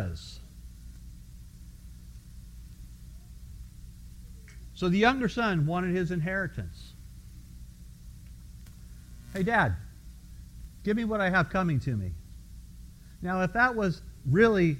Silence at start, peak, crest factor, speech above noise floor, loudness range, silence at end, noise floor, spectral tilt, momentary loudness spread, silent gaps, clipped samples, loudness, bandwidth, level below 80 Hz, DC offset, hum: 0 s; -10 dBFS; 22 dB; 21 dB; 20 LU; 0 s; -48 dBFS; -7 dB/octave; 25 LU; none; under 0.1%; -28 LUFS; 16 kHz; -46 dBFS; under 0.1%; none